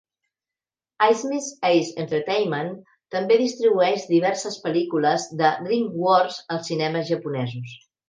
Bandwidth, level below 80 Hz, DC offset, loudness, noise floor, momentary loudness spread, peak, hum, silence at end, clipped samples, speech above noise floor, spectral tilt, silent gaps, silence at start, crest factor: 9.8 kHz; -74 dBFS; under 0.1%; -22 LUFS; under -90 dBFS; 9 LU; -4 dBFS; none; 0.3 s; under 0.1%; over 68 dB; -5 dB/octave; none; 1 s; 18 dB